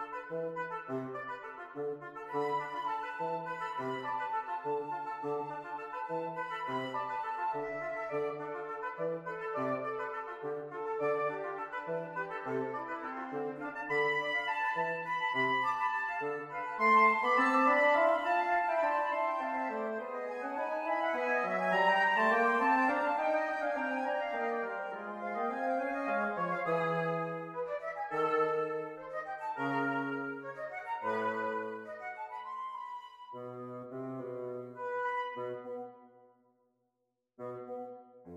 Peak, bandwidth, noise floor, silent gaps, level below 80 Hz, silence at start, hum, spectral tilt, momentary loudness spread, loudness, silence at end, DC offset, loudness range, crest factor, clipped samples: -14 dBFS; 13.5 kHz; -83 dBFS; none; -78 dBFS; 0 s; none; -6 dB/octave; 14 LU; -34 LUFS; 0 s; under 0.1%; 12 LU; 20 dB; under 0.1%